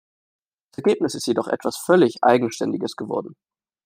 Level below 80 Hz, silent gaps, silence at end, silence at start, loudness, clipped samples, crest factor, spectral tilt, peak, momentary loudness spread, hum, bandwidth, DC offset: -68 dBFS; none; 0.55 s; 0.8 s; -21 LUFS; under 0.1%; 20 dB; -5 dB/octave; -2 dBFS; 11 LU; none; 16 kHz; under 0.1%